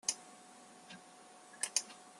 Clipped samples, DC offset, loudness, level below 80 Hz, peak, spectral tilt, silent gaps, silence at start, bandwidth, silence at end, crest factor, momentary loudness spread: under 0.1%; under 0.1%; -38 LUFS; under -90 dBFS; -14 dBFS; 1 dB/octave; none; 0.05 s; 12.5 kHz; 0 s; 30 dB; 21 LU